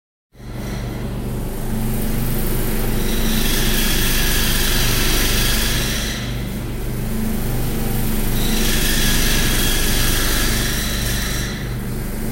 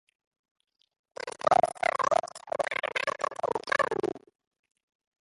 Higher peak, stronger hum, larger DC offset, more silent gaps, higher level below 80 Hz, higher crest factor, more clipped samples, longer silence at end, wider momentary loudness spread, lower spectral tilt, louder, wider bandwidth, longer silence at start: first, -4 dBFS vs -8 dBFS; neither; neither; neither; first, -20 dBFS vs -68 dBFS; second, 14 dB vs 22 dB; neither; second, 0 s vs 1.05 s; second, 9 LU vs 15 LU; about the same, -3.5 dB/octave vs -3 dB/octave; first, -20 LUFS vs -29 LUFS; first, 16 kHz vs 11.5 kHz; second, 0.35 s vs 1.25 s